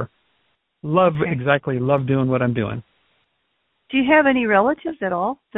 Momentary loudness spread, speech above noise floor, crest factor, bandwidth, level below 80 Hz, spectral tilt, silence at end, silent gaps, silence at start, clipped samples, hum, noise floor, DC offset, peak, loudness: 10 LU; 51 dB; 20 dB; 4 kHz; -54 dBFS; -11 dB/octave; 0.25 s; none; 0 s; under 0.1%; none; -70 dBFS; under 0.1%; 0 dBFS; -19 LUFS